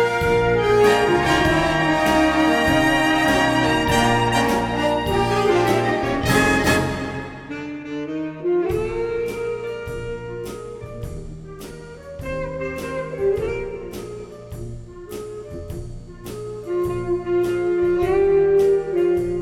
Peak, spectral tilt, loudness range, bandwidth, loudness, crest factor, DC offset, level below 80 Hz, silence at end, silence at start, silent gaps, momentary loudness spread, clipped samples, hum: -4 dBFS; -5 dB/octave; 13 LU; 18 kHz; -19 LUFS; 16 dB; under 0.1%; -38 dBFS; 0 s; 0 s; none; 17 LU; under 0.1%; none